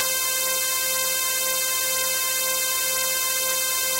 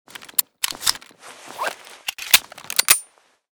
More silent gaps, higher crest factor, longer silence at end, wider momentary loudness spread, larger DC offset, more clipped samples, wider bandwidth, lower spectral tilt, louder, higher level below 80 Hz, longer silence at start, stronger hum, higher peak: neither; about the same, 20 dB vs 24 dB; second, 0 s vs 0.5 s; second, 0 LU vs 15 LU; neither; neither; second, 16 kHz vs over 20 kHz; about the same, 2 dB/octave vs 2 dB/octave; about the same, -21 LUFS vs -20 LUFS; about the same, -60 dBFS vs -60 dBFS; second, 0 s vs 0.2 s; neither; about the same, -2 dBFS vs 0 dBFS